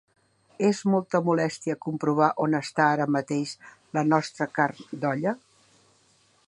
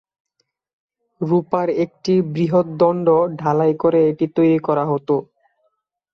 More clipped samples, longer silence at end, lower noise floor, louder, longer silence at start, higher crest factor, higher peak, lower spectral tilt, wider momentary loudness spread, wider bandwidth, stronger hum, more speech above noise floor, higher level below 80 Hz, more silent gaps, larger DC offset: neither; first, 1.1 s vs 0.9 s; second, -63 dBFS vs -69 dBFS; second, -26 LUFS vs -18 LUFS; second, 0.6 s vs 1.2 s; first, 20 dB vs 14 dB; about the same, -6 dBFS vs -4 dBFS; second, -6 dB/octave vs -9 dB/octave; first, 8 LU vs 5 LU; first, 11 kHz vs 6.8 kHz; neither; second, 38 dB vs 52 dB; second, -74 dBFS vs -62 dBFS; neither; neither